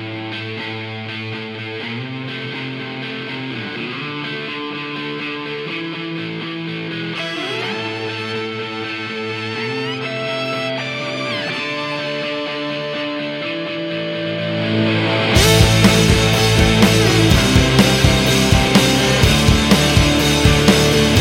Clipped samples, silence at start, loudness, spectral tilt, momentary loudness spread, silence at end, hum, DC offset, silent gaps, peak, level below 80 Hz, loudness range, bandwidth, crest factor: under 0.1%; 0 s; -17 LUFS; -4.5 dB/octave; 13 LU; 0 s; none; under 0.1%; none; 0 dBFS; -28 dBFS; 12 LU; 16.5 kHz; 18 dB